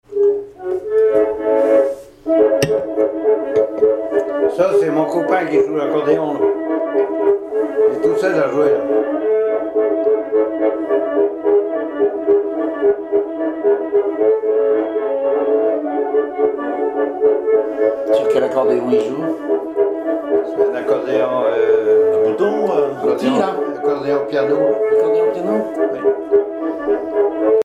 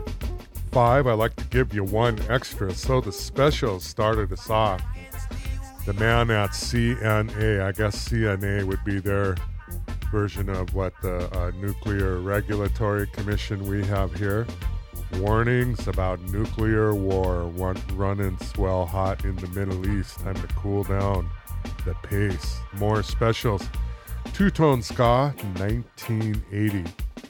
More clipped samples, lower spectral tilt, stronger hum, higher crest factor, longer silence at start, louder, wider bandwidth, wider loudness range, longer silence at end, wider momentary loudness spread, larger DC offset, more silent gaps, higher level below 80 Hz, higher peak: neither; about the same, -6.5 dB/octave vs -6.5 dB/octave; neither; second, 14 dB vs 20 dB; about the same, 0.1 s vs 0 s; first, -17 LUFS vs -25 LUFS; second, 9 kHz vs 19 kHz; second, 1 LU vs 4 LU; about the same, 0 s vs 0 s; second, 5 LU vs 11 LU; neither; neither; second, -56 dBFS vs -32 dBFS; about the same, -2 dBFS vs -4 dBFS